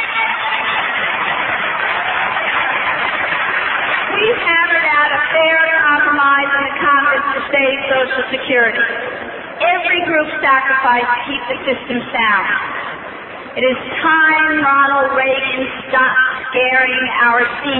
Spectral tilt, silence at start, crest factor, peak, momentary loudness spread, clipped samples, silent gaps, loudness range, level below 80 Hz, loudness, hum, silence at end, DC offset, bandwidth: -6.5 dB/octave; 0 s; 14 dB; -2 dBFS; 8 LU; under 0.1%; none; 3 LU; -52 dBFS; -14 LUFS; none; 0 s; under 0.1%; 4.2 kHz